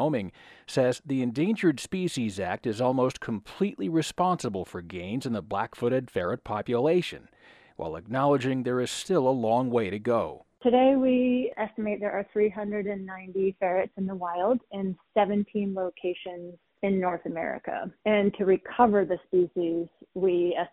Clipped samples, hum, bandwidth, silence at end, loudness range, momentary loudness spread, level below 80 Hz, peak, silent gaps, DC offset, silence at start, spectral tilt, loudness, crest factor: under 0.1%; none; 13.5 kHz; 0.05 s; 4 LU; 10 LU; -62 dBFS; -6 dBFS; none; under 0.1%; 0 s; -6.5 dB/octave; -27 LUFS; 22 dB